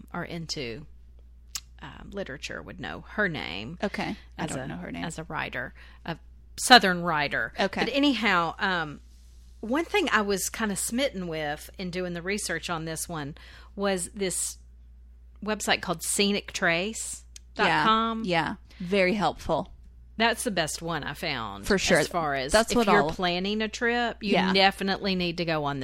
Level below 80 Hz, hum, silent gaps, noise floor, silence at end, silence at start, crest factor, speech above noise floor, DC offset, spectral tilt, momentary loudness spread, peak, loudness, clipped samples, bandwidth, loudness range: -48 dBFS; none; none; -50 dBFS; 0 s; 0 s; 24 dB; 23 dB; under 0.1%; -3.5 dB/octave; 16 LU; -4 dBFS; -26 LUFS; under 0.1%; 16 kHz; 9 LU